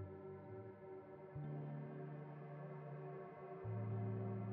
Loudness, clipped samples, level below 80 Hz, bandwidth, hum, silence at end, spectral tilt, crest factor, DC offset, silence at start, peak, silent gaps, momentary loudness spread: -50 LUFS; under 0.1%; -80 dBFS; 3.7 kHz; none; 0 s; -10 dB/octave; 14 dB; under 0.1%; 0 s; -34 dBFS; none; 10 LU